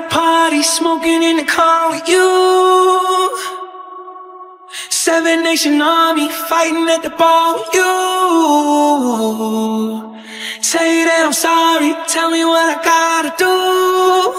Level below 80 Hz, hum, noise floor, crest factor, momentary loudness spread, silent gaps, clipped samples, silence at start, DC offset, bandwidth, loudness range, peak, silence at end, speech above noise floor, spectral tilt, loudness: -60 dBFS; none; -35 dBFS; 12 dB; 12 LU; none; under 0.1%; 0 s; under 0.1%; 16 kHz; 3 LU; 0 dBFS; 0 s; 22 dB; -2 dB/octave; -13 LUFS